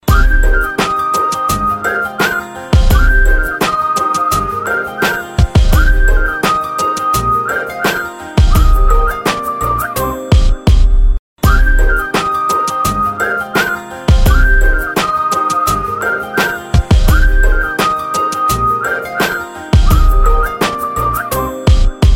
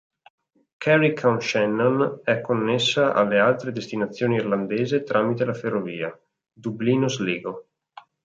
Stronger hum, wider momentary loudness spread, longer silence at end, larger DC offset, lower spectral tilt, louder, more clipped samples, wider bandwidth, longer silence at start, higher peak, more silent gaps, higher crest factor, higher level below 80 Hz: neither; second, 5 LU vs 11 LU; second, 0 s vs 0.6 s; neither; about the same, -5 dB/octave vs -5.5 dB/octave; first, -14 LUFS vs -22 LUFS; neither; first, 17 kHz vs 7.8 kHz; second, 0.05 s vs 0.8 s; first, 0 dBFS vs -6 dBFS; first, 11.19-11.36 s vs none; second, 12 dB vs 18 dB; first, -14 dBFS vs -66 dBFS